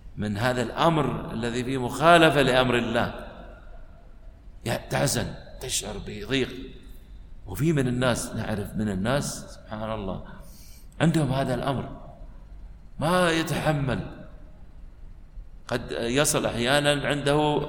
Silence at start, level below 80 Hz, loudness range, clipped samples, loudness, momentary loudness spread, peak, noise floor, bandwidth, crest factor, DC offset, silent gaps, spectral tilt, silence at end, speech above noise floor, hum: 0.05 s; -44 dBFS; 7 LU; under 0.1%; -25 LUFS; 17 LU; -2 dBFS; -45 dBFS; 17.5 kHz; 24 dB; under 0.1%; none; -4.5 dB/octave; 0 s; 21 dB; none